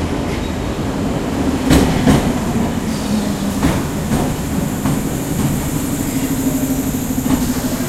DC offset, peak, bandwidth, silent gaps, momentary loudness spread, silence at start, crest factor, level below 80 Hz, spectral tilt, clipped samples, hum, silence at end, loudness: under 0.1%; 0 dBFS; 16 kHz; none; 6 LU; 0 s; 16 dB; -28 dBFS; -5.5 dB/octave; under 0.1%; none; 0 s; -18 LUFS